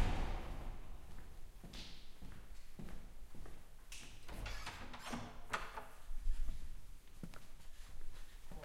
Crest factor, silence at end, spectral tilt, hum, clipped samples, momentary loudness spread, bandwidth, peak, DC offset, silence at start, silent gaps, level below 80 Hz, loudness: 20 dB; 0 s; -4.5 dB/octave; none; under 0.1%; 14 LU; 14.5 kHz; -22 dBFS; under 0.1%; 0 s; none; -46 dBFS; -51 LUFS